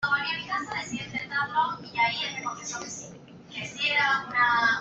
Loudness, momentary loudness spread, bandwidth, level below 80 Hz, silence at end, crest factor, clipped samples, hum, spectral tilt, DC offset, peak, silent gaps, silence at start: -27 LUFS; 14 LU; 8.2 kHz; -66 dBFS; 0 s; 18 dB; under 0.1%; none; -2 dB/octave; under 0.1%; -12 dBFS; none; 0 s